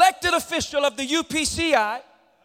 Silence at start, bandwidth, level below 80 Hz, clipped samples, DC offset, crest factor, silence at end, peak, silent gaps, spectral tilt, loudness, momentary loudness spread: 0 s; 17 kHz; -48 dBFS; under 0.1%; under 0.1%; 18 dB; 0.45 s; -4 dBFS; none; -2 dB/octave; -22 LUFS; 5 LU